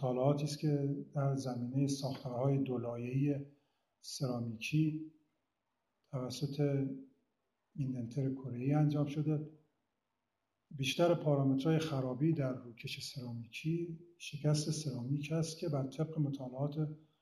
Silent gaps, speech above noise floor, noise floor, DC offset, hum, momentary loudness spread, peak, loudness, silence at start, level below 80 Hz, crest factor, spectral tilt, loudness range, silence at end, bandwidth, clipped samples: none; 51 dB; -87 dBFS; under 0.1%; none; 13 LU; -20 dBFS; -37 LUFS; 0 s; -74 dBFS; 18 dB; -6.5 dB/octave; 5 LU; 0.25 s; 13.5 kHz; under 0.1%